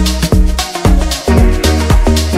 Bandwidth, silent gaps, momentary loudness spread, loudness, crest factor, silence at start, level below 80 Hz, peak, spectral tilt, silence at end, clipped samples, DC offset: 16 kHz; none; 3 LU; -12 LUFS; 10 dB; 0 s; -12 dBFS; 0 dBFS; -5 dB/octave; 0 s; under 0.1%; under 0.1%